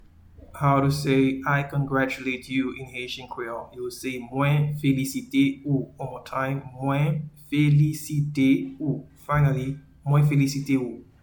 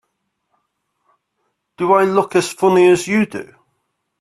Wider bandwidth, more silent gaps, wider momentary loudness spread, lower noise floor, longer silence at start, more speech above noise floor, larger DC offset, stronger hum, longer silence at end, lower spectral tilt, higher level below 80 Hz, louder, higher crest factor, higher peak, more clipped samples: first, 19 kHz vs 13 kHz; neither; about the same, 12 LU vs 11 LU; second, -49 dBFS vs -72 dBFS; second, 0.4 s vs 1.8 s; second, 25 dB vs 58 dB; neither; neither; second, 0.2 s vs 0.8 s; first, -7 dB/octave vs -5.5 dB/octave; first, -52 dBFS vs -60 dBFS; second, -25 LUFS vs -15 LUFS; about the same, 16 dB vs 18 dB; second, -8 dBFS vs 0 dBFS; neither